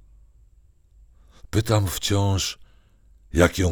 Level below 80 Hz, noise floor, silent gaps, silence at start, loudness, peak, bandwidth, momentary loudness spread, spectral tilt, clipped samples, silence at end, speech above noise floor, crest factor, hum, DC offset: -40 dBFS; -55 dBFS; none; 1.55 s; -23 LUFS; -2 dBFS; over 20 kHz; 8 LU; -5 dB/octave; under 0.1%; 0 s; 34 dB; 22 dB; none; under 0.1%